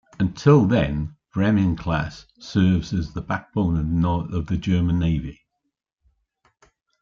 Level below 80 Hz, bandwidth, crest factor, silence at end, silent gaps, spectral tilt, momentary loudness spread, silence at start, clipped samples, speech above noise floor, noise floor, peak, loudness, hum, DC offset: -40 dBFS; 7.4 kHz; 18 dB; 1.7 s; none; -8 dB/octave; 12 LU; 0.2 s; under 0.1%; 57 dB; -78 dBFS; -4 dBFS; -22 LUFS; none; under 0.1%